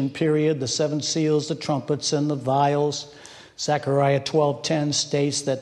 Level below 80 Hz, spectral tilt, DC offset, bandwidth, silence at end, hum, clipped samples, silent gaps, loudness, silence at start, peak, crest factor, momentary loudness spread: -64 dBFS; -4.5 dB/octave; under 0.1%; 11.5 kHz; 0 s; none; under 0.1%; none; -23 LUFS; 0 s; -8 dBFS; 14 dB; 6 LU